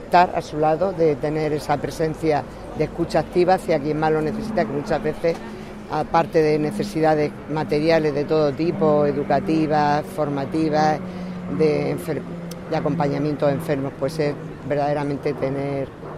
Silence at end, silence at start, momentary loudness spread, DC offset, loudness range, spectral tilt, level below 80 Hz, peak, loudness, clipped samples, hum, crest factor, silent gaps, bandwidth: 0 s; 0 s; 8 LU; under 0.1%; 3 LU; -7 dB/octave; -46 dBFS; -4 dBFS; -22 LUFS; under 0.1%; none; 18 dB; none; 14.5 kHz